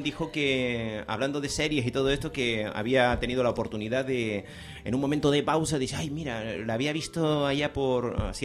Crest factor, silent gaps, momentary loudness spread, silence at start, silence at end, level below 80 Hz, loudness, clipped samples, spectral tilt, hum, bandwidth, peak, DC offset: 18 dB; none; 8 LU; 0 s; 0 s; -46 dBFS; -28 LUFS; under 0.1%; -5 dB/octave; none; 14.5 kHz; -10 dBFS; under 0.1%